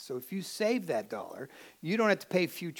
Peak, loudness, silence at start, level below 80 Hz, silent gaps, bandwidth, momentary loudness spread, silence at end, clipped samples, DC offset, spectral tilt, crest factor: -12 dBFS; -32 LUFS; 0 s; -84 dBFS; none; 19 kHz; 16 LU; 0 s; under 0.1%; under 0.1%; -5 dB/octave; 20 dB